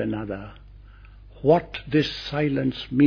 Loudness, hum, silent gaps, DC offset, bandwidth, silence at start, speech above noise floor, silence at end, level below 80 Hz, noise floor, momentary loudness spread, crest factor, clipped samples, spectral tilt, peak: -24 LUFS; none; none; under 0.1%; 5.4 kHz; 0 s; 23 dB; 0 s; -46 dBFS; -46 dBFS; 13 LU; 18 dB; under 0.1%; -7.5 dB/octave; -6 dBFS